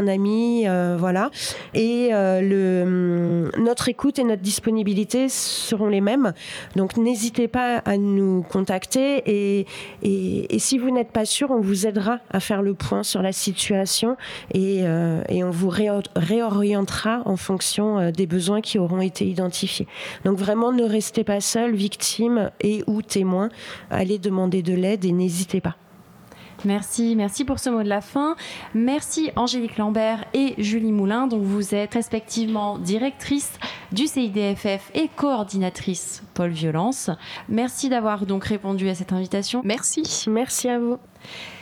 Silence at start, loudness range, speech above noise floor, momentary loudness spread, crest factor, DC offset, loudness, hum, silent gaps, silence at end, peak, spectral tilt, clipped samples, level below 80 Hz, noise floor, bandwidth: 0 s; 3 LU; 25 dB; 6 LU; 14 dB; under 0.1%; -22 LUFS; none; none; 0 s; -8 dBFS; -5 dB/octave; under 0.1%; -54 dBFS; -47 dBFS; 16.5 kHz